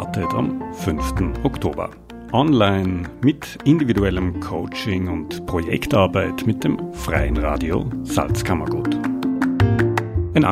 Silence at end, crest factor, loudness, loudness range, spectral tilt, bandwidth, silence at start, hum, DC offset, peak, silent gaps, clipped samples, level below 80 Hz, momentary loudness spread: 0 s; 18 dB; -21 LUFS; 2 LU; -6.5 dB/octave; 15.5 kHz; 0 s; none; under 0.1%; -2 dBFS; none; under 0.1%; -32 dBFS; 8 LU